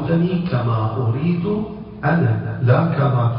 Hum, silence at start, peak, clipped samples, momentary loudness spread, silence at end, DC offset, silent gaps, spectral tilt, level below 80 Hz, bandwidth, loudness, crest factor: none; 0 s; -2 dBFS; under 0.1%; 7 LU; 0 s; under 0.1%; none; -13.5 dB/octave; -44 dBFS; 5.4 kHz; -19 LUFS; 16 dB